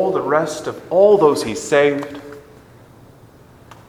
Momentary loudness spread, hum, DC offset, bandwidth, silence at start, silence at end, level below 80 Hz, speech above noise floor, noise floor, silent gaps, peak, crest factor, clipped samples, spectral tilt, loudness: 19 LU; none; under 0.1%; 14.5 kHz; 0 s; 1.5 s; -56 dBFS; 29 dB; -45 dBFS; none; 0 dBFS; 18 dB; under 0.1%; -5 dB/octave; -16 LUFS